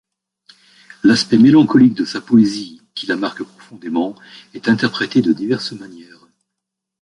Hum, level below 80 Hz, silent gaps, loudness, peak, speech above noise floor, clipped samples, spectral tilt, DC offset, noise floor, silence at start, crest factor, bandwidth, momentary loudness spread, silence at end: none; -58 dBFS; none; -15 LUFS; -2 dBFS; 65 dB; under 0.1%; -5.5 dB/octave; under 0.1%; -80 dBFS; 1.05 s; 16 dB; 11 kHz; 20 LU; 1 s